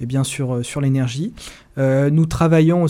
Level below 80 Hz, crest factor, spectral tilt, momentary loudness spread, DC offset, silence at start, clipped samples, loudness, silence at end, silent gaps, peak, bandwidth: -42 dBFS; 14 dB; -7 dB/octave; 13 LU; under 0.1%; 0 s; under 0.1%; -18 LUFS; 0 s; none; -4 dBFS; 14 kHz